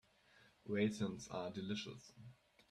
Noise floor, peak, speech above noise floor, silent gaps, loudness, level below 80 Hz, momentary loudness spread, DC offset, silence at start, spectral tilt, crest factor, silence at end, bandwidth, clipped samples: -70 dBFS; -24 dBFS; 27 dB; none; -43 LUFS; -76 dBFS; 21 LU; under 0.1%; 0.35 s; -5.5 dB/octave; 20 dB; 0.35 s; 12 kHz; under 0.1%